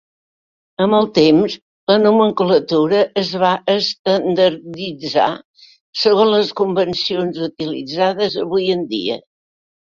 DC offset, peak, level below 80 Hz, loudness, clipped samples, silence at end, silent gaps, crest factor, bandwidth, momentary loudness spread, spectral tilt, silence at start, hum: under 0.1%; -2 dBFS; -58 dBFS; -16 LUFS; under 0.1%; 0.7 s; 1.62-1.87 s, 3.99-4.05 s, 5.45-5.54 s, 5.80-5.93 s; 16 dB; 7.4 kHz; 12 LU; -6 dB/octave; 0.8 s; none